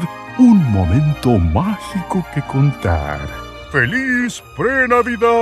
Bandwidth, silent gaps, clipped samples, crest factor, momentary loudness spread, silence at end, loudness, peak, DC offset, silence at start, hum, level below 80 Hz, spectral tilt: 13 kHz; none; under 0.1%; 14 dB; 11 LU; 0 s; -16 LUFS; -2 dBFS; under 0.1%; 0 s; none; -32 dBFS; -7 dB/octave